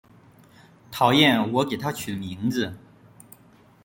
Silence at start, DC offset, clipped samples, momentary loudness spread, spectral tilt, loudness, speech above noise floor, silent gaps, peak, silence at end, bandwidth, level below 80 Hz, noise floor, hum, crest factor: 0.9 s; under 0.1%; under 0.1%; 14 LU; -5 dB/octave; -23 LUFS; 32 dB; none; -4 dBFS; 1.05 s; 17 kHz; -62 dBFS; -54 dBFS; none; 22 dB